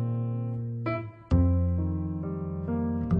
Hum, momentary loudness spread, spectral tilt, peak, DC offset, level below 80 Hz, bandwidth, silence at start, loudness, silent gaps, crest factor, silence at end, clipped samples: none; 8 LU; -11 dB/octave; -12 dBFS; under 0.1%; -38 dBFS; 4.7 kHz; 0 s; -29 LUFS; none; 16 dB; 0 s; under 0.1%